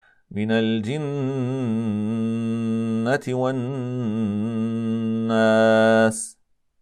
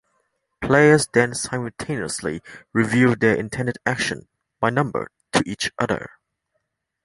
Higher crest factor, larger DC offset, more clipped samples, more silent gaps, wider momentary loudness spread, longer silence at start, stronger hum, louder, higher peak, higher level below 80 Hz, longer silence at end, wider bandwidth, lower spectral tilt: second, 14 dB vs 20 dB; neither; neither; neither; second, 10 LU vs 13 LU; second, 0.3 s vs 0.6 s; neither; about the same, -22 LUFS vs -21 LUFS; second, -8 dBFS vs -2 dBFS; second, -68 dBFS vs -52 dBFS; second, 0.5 s vs 1 s; about the same, 11.5 kHz vs 11.5 kHz; about the same, -6 dB/octave vs -5 dB/octave